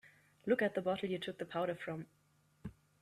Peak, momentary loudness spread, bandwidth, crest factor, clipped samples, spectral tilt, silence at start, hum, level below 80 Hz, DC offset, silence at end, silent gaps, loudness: -20 dBFS; 19 LU; 14.5 kHz; 20 dB; under 0.1%; -6.5 dB/octave; 0.05 s; none; -72 dBFS; under 0.1%; 0.3 s; none; -38 LUFS